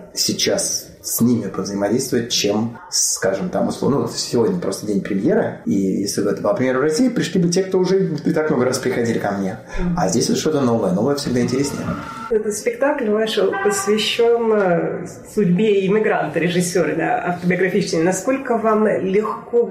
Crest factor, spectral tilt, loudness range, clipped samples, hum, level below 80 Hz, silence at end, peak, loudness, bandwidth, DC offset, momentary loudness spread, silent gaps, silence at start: 12 dB; -4.5 dB/octave; 2 LU; under 0.1%; none; -44 dBFS; 0 s; -6 dBFS; -19 LUFS; 15.5 kHz; under 0.1%; 6 LU; none; 0 s